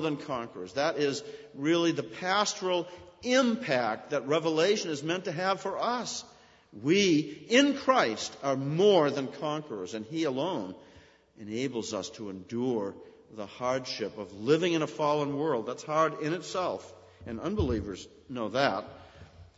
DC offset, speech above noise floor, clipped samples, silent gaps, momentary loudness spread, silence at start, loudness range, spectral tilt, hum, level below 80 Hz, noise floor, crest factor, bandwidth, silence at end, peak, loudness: under 0.1%; 28 dB; under 0.1%; none; 14 LU; 0 s; 8 LU; -4.5 dB/octave; none; -56 dBFS; -57 dBFS; 20 dB; 8 kHz; 0.15 s; -8 dBFS; -29 LUFS